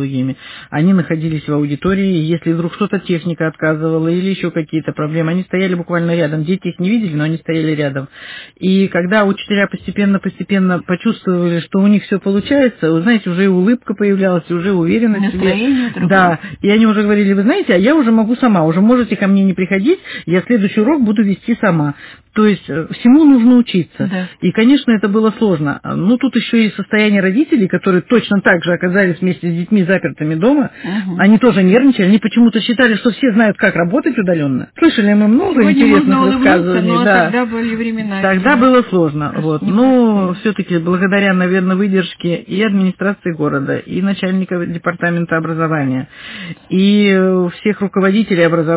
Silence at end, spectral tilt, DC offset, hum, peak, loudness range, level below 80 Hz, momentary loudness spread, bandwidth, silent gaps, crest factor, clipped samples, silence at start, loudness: 0 s; -11 dB/octave; under 0.1%; none; 0 dBFS; 5 LU; -48 dBFS; 8 LU; 4 kHz; none; 12 dB; under 0.1%; 0 s; -13 LUFS